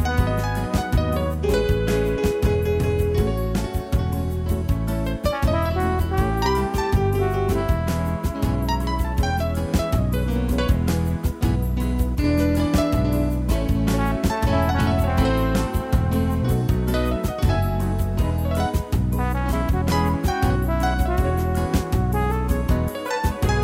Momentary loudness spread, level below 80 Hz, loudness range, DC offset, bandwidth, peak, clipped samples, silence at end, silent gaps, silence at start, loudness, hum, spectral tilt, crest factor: 4 LU; -26 dBFS; 2 LU; under 0.1%; 16 kHz; -6 dBFS; under 0.1%; 0 s; none; 0 s; -22 LUFS; none; -7 dB/octave; 14 dB